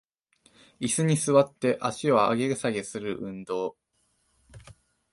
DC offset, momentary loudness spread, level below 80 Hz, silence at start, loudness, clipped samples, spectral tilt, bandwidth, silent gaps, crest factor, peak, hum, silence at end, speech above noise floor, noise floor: under 0.1%; 12 LU; -64 dBFS; 0.8 s; -26 LUFS; under 0.1%; -5 dB/octave; 11.5 kHz; none; 20 dB; -8 dBFS; none; 0.4 s; 46 dB; -71 dBFS